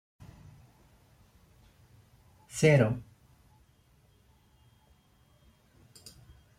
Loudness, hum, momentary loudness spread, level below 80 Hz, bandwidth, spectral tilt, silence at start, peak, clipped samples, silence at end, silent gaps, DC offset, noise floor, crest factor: -27 LUFS; none; 30 LU; -62 dBFS; 14.5 kHz; -6 dB/octave; 2.55 s; -10 dBFS; under 0.1%; 3.55 s; none; under 0.1%; -65 dBFS; 24 dB